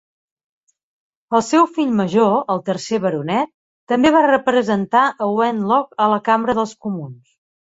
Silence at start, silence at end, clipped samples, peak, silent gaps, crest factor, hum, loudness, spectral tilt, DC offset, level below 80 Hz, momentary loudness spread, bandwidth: 1.3 s; 0.6 s; under 0.1%; -2 dBFS; 3.54-3.87 s; 16 dB; none; -17 LUFS; -5.5 dB/octave; under 0.1%; -58 dBFS; 8 LU; 8 kHz